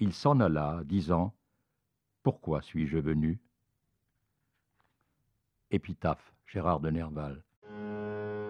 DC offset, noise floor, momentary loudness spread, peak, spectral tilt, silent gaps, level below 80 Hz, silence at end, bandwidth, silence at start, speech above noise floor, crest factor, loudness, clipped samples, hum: under 0.1%; -82 dBFS; 14 LU; -12 dBFS; -8.5 dB/octave; 7.57-7.62 s; -54 dBFS; 0 s; 9.8 kHz; 0 s; 52 dB; 22 dB; -32 LUFS; under 0.1%; none